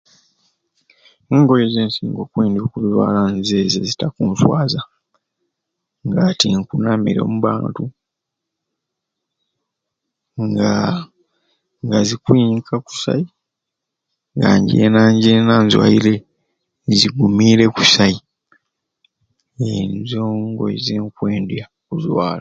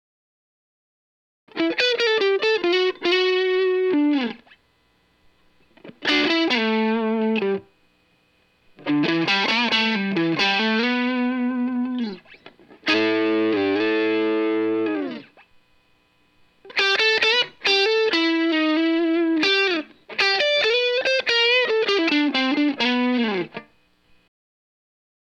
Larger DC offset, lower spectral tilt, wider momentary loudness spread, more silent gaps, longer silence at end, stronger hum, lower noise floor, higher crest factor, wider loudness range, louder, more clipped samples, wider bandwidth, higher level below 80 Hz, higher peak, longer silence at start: neither; first, -5.5 dB/octave vs -4 dB/octave; first, 13 LU vs 9 LU; neither; second, 0 s vs 1.6 s; neither; first, -80 dBFS vs -63 dBFS; about the same, 18 dB vs 16 dB; first, 10 LU vs 4 LU; first, -16 LUFS vs -20 LUFS; neither; second, 7.8 kHz vs 9.2 kHz; first, -50 dBFS vs -72 dBFS; first, 0 dBFS vs -6 dBFS; second, 1.3 s vs 1.55 s